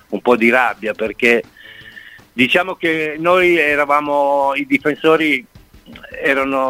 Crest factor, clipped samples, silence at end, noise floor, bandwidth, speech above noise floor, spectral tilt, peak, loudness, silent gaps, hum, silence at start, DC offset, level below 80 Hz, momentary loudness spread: 16 dB; under 0.1%; 0 s; -39 dBFS; 16 kHz; 24 dB; -5 dB/octave; 0 dBFS; -15 LUFS; none; none; 0.1 s; under 0.1%; -52 dBFS; 10 LU